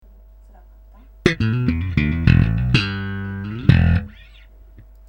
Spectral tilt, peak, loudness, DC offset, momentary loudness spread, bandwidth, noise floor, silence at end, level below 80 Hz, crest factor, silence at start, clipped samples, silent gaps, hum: -7.5 dB/octave; 0 dBFS; -19 LUFS; under 0.1%; 12 LU; 8.6 kHz; -45 dBFS; 0.3 s; -30 dBFS; 20 dB; 1.25 s; under 0.1%; none; none